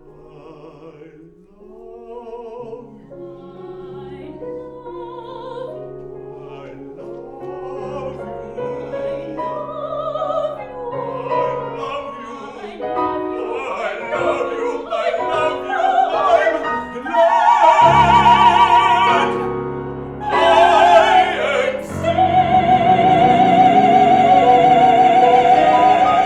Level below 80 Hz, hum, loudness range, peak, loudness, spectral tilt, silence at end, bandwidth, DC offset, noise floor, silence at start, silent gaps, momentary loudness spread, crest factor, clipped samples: -46 dBFS; none; 21 LU; 0 dBFS; -14 LUFS; -5.5 dB/octave; 0 s; 10 kHz; under 0.1%; -44 dBFS; 0.45 s; none; 23 LU; 16 dB; under 0.1%